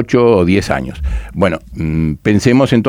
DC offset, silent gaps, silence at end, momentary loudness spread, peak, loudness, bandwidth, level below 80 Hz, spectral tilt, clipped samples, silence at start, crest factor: under 0.1%; none; 0 s; 11 LU; 0 dBFS; -14 LUFS; 15.5 kHz; -26 dBFS; -7 dB/octave; under 0.1%; 0 s; 12 dB